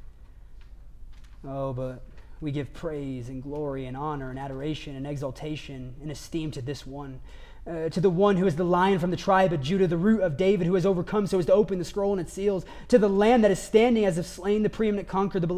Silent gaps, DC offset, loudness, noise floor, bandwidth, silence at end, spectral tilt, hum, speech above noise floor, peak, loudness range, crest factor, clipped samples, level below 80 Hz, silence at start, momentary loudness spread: none; under 0.1%; -26 LUFS; -46 dBFS; 15 kHz; 0 s; -7 dB/octave; none; 20 dB; -6 dBFS; 12 LU; 20 dB; under 0.1%; -46 dBFS; 0 s; 15 LU